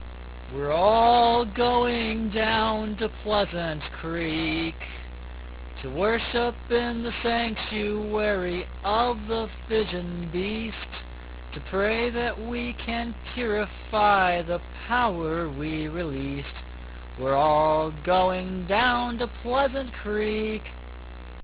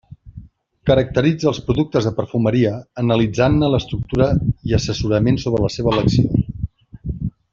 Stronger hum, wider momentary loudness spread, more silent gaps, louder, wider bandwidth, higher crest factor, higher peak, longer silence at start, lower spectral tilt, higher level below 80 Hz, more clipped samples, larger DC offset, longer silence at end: neither; first, 17 LU vs 11 LU; neither; second, -25 LUFS vs -18 LUFS; second, 4 kHz vs 7.6 kHz; about the same, 18 dB vs 16 dB; second, -8 dBFS vs -2 dBFS; second, 0 s vs 0.25 s; first, -9 dB/octave vs -7 dB/octave; second, -40 dBFS vs -34 dBFS; neither; neither; second, 0 s vs 0.25 s